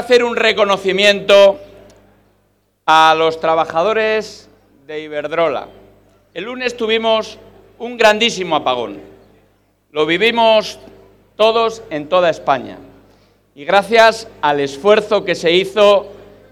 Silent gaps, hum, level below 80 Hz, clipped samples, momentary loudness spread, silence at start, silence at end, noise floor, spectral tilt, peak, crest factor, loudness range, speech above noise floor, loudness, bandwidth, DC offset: none; 50 Hz at -50 dBFS; -54 dBFS; under 0.1%; 18 LU; 0 s; 0.35 s; -60 dBFS; -3.5 dB/octave; 0 dBFS; 16 dB; 7 LU; 46 dB; -14 LUFS; 14.5 kHz; under 0.1%